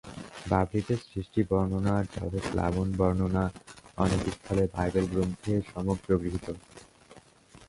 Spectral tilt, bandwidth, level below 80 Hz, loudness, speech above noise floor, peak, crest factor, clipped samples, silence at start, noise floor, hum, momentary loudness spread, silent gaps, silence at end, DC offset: -7.5 dB/octave; 11.5 kHz; -44 dBFS; -29 LUFS; 27 dB; -10 dBFS; 20 dB; under 0.1%; 0.05 s; -55 dBFS; none; 9 LU; none; 0.05 s; under 0.1%